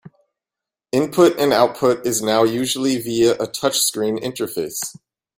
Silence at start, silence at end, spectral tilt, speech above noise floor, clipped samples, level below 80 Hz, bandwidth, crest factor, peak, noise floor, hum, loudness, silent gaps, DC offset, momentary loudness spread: 0.05 s; 0.45 s; -3.5 dB/octave; 69 dB; under 0.1%; -60 dBFS; 16.5 kHz; 18 dB; 0 dBFS; -87 dBFS; none; -18 LUFS; none; under 0.1%; 10 LU